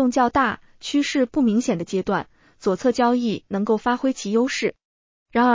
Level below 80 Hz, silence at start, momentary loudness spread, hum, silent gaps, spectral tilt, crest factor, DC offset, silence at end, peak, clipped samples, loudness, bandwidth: -54 dBFS; 0 s; 7 LU; none; 4.85-5.26 s; -5 dB/octave; 14 dB; under 0.1%; 0 s; -6 dBFS; under 0.1%; -22 LUFS; 7.6 kHz